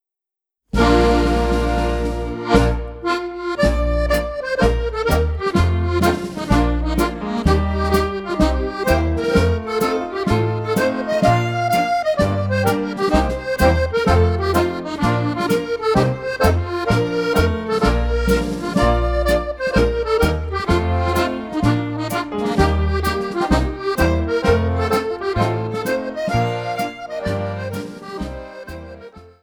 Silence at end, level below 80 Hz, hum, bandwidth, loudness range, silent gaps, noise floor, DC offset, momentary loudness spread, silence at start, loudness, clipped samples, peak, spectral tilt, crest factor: 0.15 s; -26 dBFS; none; over 20 kHz; 2 LU; none; -87 dBFS; under 0.1%; 7 LU; 0.75 s; -19 LUFS; under 0.1%; 0 dBFS; -6.5 dB/octave; 18 dB